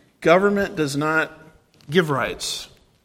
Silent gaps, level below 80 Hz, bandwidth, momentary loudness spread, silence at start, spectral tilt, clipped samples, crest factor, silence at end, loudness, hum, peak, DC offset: none; -52 dBFS; 16.5 kHz; 12 LU; 0.2 s; -4.5 dB/octave; under 0.1%; 20 dB; 0.4 s; -21 LUFS; none; -2 dBFS; under 0.1%